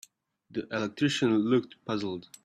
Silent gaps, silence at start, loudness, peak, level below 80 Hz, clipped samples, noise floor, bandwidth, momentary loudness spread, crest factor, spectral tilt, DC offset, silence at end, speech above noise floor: none; 0.55 s; -29 LUFS; -14 dBFS; -70 dBFS; under 0.1%; -62 dBFS; 12.5 kHz; 12 LU; 16 dB; -5.5 dB/octave; under 0.1%; 0.25 s; 33 dB